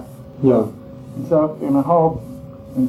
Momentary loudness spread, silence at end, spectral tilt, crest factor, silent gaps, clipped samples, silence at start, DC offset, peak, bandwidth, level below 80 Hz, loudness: 19 LU; 0 s; -10 dB/octave; 16 dB; none; under 0.1%; 0 s; under 0.1%; -4 dBFS; 13 kHz; -48 dBFS; -18 LUFS